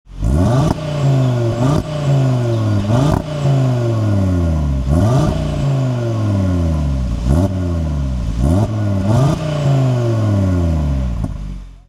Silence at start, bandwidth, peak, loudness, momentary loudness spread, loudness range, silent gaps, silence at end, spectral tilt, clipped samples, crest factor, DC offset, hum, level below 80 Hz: 0.1 s; 12.5 kHz; -2 dBFS; -16 LUFS; 5 LU; 2 LU; none; 0.1 s; -8 dB/octave; under 0.1%; 14 dB; under 0.1%; none; -24 dBFS